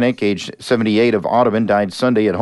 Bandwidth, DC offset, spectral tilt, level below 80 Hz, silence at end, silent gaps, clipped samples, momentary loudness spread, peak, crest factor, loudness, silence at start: 11.5 kHz; under 0.1%; -6 dB/octave; -58 dBFS; 0 s; none; under 0.1%; 5 LU; -2 dBFS; 14 dB; -16 LUFS; 0 s